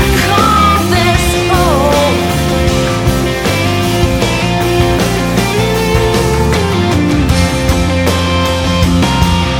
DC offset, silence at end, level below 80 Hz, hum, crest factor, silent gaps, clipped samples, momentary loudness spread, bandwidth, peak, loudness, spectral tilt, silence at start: under 0.1%; 0 s; -20 dBFS; none; 10 dB; none; under 0.1%; 3 LU; 17.5 kHz; 0 dBFS; -11 LUFS; -5 dB/octave; 0 s